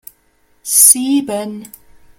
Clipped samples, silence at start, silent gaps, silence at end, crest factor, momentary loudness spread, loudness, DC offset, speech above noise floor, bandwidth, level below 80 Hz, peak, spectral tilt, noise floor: 0.3%; 0.65 s; none; 0.55 s; 16 dB; 23 LU; -10 LUFS; under 0.1%; 43 dB; over 20 kHz; -56 dBFS; 0 dBFS; -1.5 dB/octave; -56 dBFS